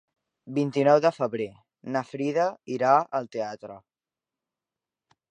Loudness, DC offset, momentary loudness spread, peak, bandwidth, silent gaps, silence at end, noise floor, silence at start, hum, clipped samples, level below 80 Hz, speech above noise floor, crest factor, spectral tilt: -26 LUFS; under 0.1%; 15 LU; -6 dBFS; 9.6 kHz; none; 1.5 s; under -90 dBFS; 0.45 s; none; under 0.1%; -76 dBFS; over 65 dB; 20 dB; -6.5 dB/octave